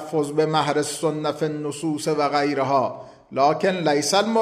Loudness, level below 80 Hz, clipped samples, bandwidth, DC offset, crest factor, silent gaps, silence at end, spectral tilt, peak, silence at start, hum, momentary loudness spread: -22 LUFS; -68 dBFS; under 0.1%; 14 kHz; under 0.1%; 16 dB; none; 0 s; -4.5 dB/octave; -6 dBFS; 0 s; none; 7 LU